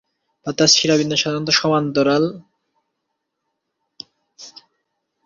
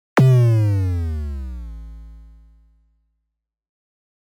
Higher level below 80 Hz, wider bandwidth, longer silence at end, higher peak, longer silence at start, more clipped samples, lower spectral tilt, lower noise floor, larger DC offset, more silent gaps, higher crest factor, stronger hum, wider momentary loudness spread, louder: second, -60 dBFS vs -36 dBFS; second, 7.6 kHz vs 10.5 kHz; second, 0.75 s vs 2 s; first, 0 dBFS vs -6 dBFS; first, 0.45 s vs 0.15 s; neither; second, -3.5 dB/octave vs -8.5 dB/octave; about the same, -77 dBFS vs -79 dBFS; neither; neither; first, 20 dB vs 14 dB; neither; second, 11 LU vs 24 LU; about the same, -16 LUFS vs -18 LUFS